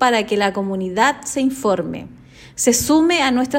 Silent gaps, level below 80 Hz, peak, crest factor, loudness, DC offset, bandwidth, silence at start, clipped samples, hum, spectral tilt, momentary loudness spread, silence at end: none; -48 dBFS; -2 dBFS; 16 dB; -17 LUFS; under 0.1%; 16.5 kHz; 0 s; under 0.1%; none; -3.5 dB/octave; 9 LU; 0 s